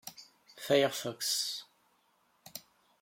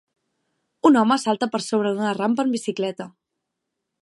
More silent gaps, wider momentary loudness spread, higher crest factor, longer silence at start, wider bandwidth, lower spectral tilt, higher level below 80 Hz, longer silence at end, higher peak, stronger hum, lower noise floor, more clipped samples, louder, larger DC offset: neither; first, 20 LU vs 11 LU; about the same, 22 dB vs 18 dB; second, 0.05 s vs 0.85 s; first, 16.5 kHz vs 11.5 kHz; second, -2.5 dB/octave vs -5 dB/octave; second, -82 dBFS vs -74 dBFS; second, 0.4 s vs 0.9 s; second, -14 dBFS vs -4 dBFS; neither; second, -72 dBFS vs -80 dBFS; neither; second, -31 LUFS vs -21 LUFS; neither